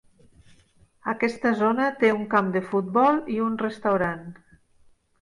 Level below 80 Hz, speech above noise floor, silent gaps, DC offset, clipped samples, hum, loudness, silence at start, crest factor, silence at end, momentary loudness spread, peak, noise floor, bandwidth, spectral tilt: -62 dBFS; 35 dB; none; under 0.1%; under 0.1%; none; -24 LUFS; 1.05 s; 18 dB; 0.9 s; 9 LU; -8 dBFS; -58 dBFS; 11 kHz; -7 dB/octave